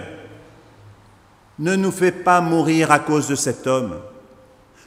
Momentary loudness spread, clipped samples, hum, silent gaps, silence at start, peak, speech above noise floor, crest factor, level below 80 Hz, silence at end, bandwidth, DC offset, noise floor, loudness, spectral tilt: 15 LU; under 0.1%; none; none; 0 s; 0 dBFS; 33 dB; 20 dB; -58 dBFS; 0.7 s; 16 kHz; under 0.1%; -51 dBFS; -18 LUFS; -5 dB/octave